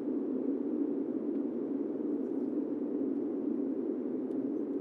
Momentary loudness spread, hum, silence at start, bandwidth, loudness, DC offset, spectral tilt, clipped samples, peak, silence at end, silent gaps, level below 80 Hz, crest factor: 2 LU; none; 0 s; 3 kHz; -35 LUFS; under 0.1%; -10.5 dB/octave; under 0.1%; -22 dBFS; 0 s; none; under -90 dBFS; 12 dB